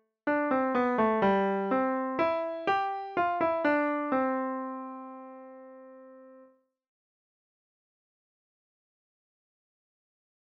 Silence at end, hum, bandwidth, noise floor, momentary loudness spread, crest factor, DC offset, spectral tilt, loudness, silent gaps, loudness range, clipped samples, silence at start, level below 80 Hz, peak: 4.1 s; 60 Hz at -80 dBFS; 6.8 kHz; -60 dBFS; 19 LU; 18 dB; under 0.1%; -8 dB/octave; -28 LUFS; none; 16 LU; under 0.1%; 0.25 s; -70 dBFS; -14 dBFS